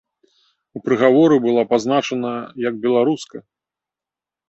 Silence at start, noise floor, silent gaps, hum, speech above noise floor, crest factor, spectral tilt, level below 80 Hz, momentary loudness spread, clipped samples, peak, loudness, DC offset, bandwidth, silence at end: 0.75 s; -89 dBFS; none; none; 71 dB; 16 dB; -6 dB/octave; -64 dBFS; 14 LU; under 0.1%; -2 dBFS; -17 LUFS; under 0.1%; 8.2 kHz; 1.1 s